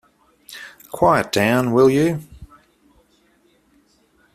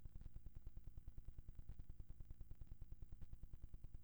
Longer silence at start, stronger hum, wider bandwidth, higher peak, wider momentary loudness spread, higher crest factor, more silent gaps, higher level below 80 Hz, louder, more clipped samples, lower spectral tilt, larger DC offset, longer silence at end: first, 0.5 s vs 0 s; neither; second, 15 kHz vs over 20 kHz; first, -2 dBFS vs -40 dBFS; first, 22 LU vs 1 LU; about the same, 18 dB vs 14 dB; neither; about the same, -52 dBFS vs -56 dBFS; first, -17 LUFS vs -62 LUFS; neither; second, -6 dB/octave vs -7.5 dB/octave; neither; first, 1.9 s vs 0 s